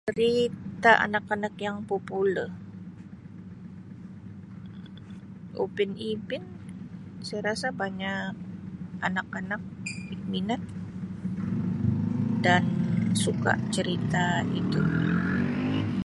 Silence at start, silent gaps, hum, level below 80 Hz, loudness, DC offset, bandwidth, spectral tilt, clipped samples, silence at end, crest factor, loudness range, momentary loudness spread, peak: 0.05 s; none; none; -54 dBFS; -28 LUFS; under 0.1%; 11.5 kHz; -6 dB/octave; under 0.1%; 0 s; 24 dB; 10 LU; 20 LU; -4 dBFS